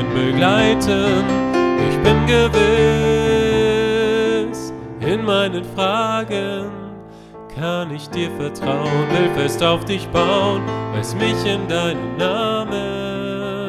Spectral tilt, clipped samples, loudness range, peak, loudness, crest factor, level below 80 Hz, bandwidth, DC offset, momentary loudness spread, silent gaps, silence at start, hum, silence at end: -5.5 dB/octave; under 0.1%; 7 LU; 0 dBFS; -18 LUFS; 18 dB; -36 dBFS; 14 kHz; under 0.1%; 11 LU; none; 0 s; none; 0 s